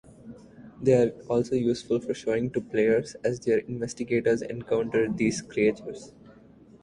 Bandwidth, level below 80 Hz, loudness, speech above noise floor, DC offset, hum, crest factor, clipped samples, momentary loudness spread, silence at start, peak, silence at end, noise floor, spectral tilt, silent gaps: 11 kHz; -58 dBFS; -26 LUFS; 27 dB; under 0.1%; none; 18 dB; under 0.1%; 8 LU; 0.25 s; -8 dBFS; 0.55 s; -53 dBFS; -6 dB/octave; none